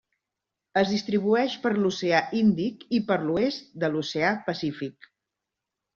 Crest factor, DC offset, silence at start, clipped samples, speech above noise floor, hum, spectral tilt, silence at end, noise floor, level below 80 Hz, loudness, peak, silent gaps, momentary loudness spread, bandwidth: 20 dB; under 0.1%; 0.75 s; under 0.1%; 61 dB; none; -4.5 dB/octave; 1.05 s; -86 dBFS; -64 dBFS; -26 LUFS; -8 dBFS; none; 7 LU; 7.2 kHz